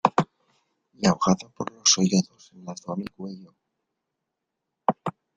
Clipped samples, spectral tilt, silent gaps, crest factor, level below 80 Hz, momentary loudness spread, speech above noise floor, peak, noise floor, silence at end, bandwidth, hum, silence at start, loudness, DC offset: under 0.1%; -4 dB/octave; none; 26 dB; -62 dBFS; 19 LU; 58 dB; -2 dBFS; -83 dBFS; 0.25 s; 9.4 kHz; none; 0.05 s; -24 LUFS; under 0.1%